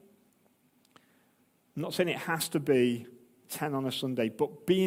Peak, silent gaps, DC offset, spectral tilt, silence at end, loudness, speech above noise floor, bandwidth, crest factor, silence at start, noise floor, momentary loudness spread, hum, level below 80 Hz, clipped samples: -14 dBFS; none; under 0.1%; -5 dB/octave; 0 s; -31 LUFS; 39 dB; 16.5 kHz; 18 dB; 1.75 s; -69 dBFS; 13 LU; none; -76 dBFS; under 0.1%